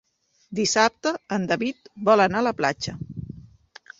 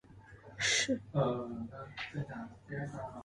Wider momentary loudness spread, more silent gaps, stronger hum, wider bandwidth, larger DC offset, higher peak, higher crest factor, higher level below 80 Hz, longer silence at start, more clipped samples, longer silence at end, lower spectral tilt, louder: first, 18 LU vs 15 LU; neither; neither; second, 8.2 kHz vs 11.5 kHz; neither; first, -4 dBFS vs -20 dBFS; about the same, 22 dB vs 18 dB; first, -56 dBFS vs -64 dBFS; first, 0.5 s vs 0.1 s; neither; first, 0.55 s vs 0 s; about the same, -4 dB/octave vs -3.5 dB/octave; first, -23 LUFS vs -36 LUFS